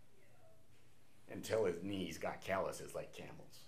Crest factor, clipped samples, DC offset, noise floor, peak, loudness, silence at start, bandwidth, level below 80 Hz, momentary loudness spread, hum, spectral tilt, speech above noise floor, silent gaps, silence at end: 20 dB; under 0.1%; 0.2%; -70 dBFS; -24 dBFS; -43 LUFS; 0.45 s; 15.5 kHz; -72 dBFS; 15 LU; none; -4.5 dB/octave; 28 dB; none; 0 s